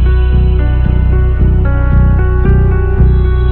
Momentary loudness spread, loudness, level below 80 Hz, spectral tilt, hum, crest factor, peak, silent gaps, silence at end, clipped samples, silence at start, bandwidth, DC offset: 2 LU; -11 LUFS; -10 dBFS; -11.5 dB/octave; none; 8 dB; 0 dBFS; none; 0 s; under 0.1%; 0 s; 4.1 kHz; under 0.1%